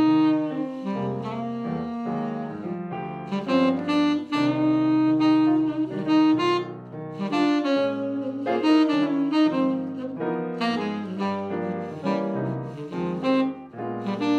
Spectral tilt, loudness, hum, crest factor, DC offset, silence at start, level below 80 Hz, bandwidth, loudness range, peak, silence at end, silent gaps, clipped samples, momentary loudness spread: -7 dB/octave; -24 LUFS; none; 14 dB; under 0.1%; 0 s; -68 dBFS; 8.2 kHz; 6 LU; -10 dBFS; 0 s; none; under 0.1%; 12 LU